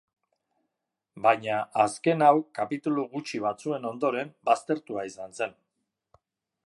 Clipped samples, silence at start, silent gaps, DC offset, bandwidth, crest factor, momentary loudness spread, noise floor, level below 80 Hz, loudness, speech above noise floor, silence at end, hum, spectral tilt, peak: under 0.1%; 1.15 s; none; under 0.1%; 11.5 kHz; 22 dB; 12 LU; -84 dBFS; -76 dBFS; -27 LUFS; 58 dB; 1.15 s; none; -5.5 dB/octave; -6 dBFS